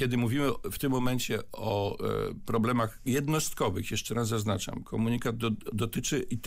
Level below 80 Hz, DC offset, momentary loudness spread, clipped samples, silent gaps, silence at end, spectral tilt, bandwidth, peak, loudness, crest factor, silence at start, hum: -48 dBFS; under 0.1%; 5 LU; under 0.1%; none; 0 s; -5 dB/octave; 16 kHz; -16 dBFS; -31 LUFS; 12 dB; 0 s; none